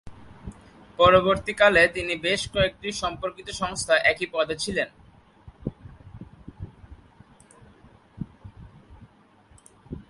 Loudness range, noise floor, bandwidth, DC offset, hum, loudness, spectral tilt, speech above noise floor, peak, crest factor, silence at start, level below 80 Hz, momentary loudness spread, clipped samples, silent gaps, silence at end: 24 LU; -56 dBFS; 11.5 kHz; under 0.1%; none; -22 LUFS; -3.5 dB/octave; 34 dB; -4 dBFS; 22 dB; 0.05 s; -48 dBFS; 26 LU; under 0.1%; none; 0.1 s